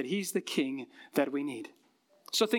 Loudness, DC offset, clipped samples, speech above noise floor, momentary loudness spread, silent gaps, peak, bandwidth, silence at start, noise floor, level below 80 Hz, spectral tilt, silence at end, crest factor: -33 LUFS; under 0.1%; under 0.1%; 26 dB; 11 LU; none; -12 dBFS; 18 kHz; 0 s; -59 dBFS; under -90 dBFS; -3.5 dB/octave; 0 s; 20 dB